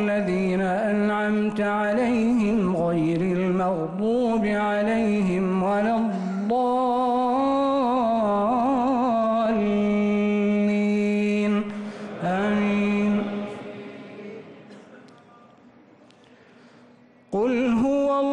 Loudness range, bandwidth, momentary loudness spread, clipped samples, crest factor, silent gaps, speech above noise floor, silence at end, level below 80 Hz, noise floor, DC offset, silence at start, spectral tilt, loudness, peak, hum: 8 LU; 9.6 kHz; 8 LU; under 0.1%; 8 dB; none; 31 dB; 0 s; -54 dBFS; -53 dBFS; under 0.1%; 0 s; -7.5 dB/octave; -23 LUFS; -14 dBFS; none